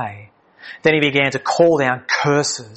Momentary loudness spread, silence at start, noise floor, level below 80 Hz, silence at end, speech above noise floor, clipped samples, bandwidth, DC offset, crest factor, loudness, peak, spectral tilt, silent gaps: 5 LU; 0 s; -42 dBFS; -60 dBFS; 0 s; 25 dB; under 0.1%; 8.6 kHz; under 0.1%; 18 dB; -16 LUFS; 0 dBFS; -4 dB/octave; none